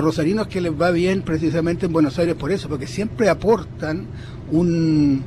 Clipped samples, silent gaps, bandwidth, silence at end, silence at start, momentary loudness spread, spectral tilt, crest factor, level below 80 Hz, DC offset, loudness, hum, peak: under 0.1%; none; 13 kHz; 0 s; 0 s; 9 LU; -7 dB/octave; 14 dB; -40 dBFS; under 0.1%; -20 LUFS; none; -6 dBFS